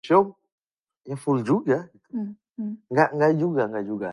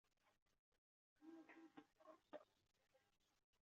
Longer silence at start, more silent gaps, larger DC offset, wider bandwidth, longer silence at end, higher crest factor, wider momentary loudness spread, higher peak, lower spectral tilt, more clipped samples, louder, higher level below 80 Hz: about the same, 0.05 s vs 0.05 s; second, 0.52-0.67 s, 0.73-0.85 s, 0.97-1.01 s vs 0.42-0.46 s, 0.59-0.72 s, 0.78-1.16 s, 3.44-3.53 s; neither; first, 11.5 kHz vs 7 kHz; about the same, 0 s vs 0.05 s; about the same, 22 dB vs 24 dB; first, 14 LU vs 4 LU; first, -2 dBFS vs -46 dBFS; first, -8 dB/octave vs -3 dB/octave; neither; first, -24 LUFS vs -66 LUFS; first, -70 dBFS vs under -90 dBFS